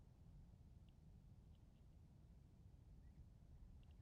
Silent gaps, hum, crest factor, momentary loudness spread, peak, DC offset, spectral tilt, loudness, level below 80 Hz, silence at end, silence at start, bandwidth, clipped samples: none; none; 12 dB; 2 LU; -52 dBFS; under 0.1%; -8.5 dB/octave; -68 LUFS; -68 dBFS; 0 s; 0 s; 6.6 kHz; under 0.1%